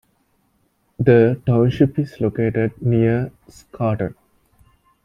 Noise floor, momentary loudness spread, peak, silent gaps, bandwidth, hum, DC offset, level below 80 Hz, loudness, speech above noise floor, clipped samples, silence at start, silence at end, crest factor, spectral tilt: -64 dBFS; 10 LU; -2 dBFS; none; 7.2 kHz; none; under 0.1%; -48 dBFS; -18 LUFS; 47 dB; under 0.1%; 1 s; 0.9 s; 18 dB; -9.5 dB/octave